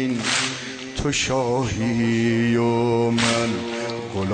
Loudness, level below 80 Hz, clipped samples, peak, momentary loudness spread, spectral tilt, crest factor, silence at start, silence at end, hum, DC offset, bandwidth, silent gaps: -22 LUFS; -44 dBFS; under 0.1%; -6 dBFS; 8 LU; -4.5 dB/octave; 16 dB; 0 s; 0 s; none; under 0.1%; 9.4 kHz; none